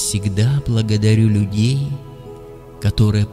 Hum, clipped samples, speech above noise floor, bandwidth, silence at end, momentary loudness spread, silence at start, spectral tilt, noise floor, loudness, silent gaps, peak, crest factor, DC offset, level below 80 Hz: none; under 0.1%; 20 dB; 13.5 kHz; 0 s; 21 LU; 0 s; -6 dB/octave; -36 dBFS; -17 LUFS; none; -2 dBFS; 14 dB; under 0.1%; -36 dBFS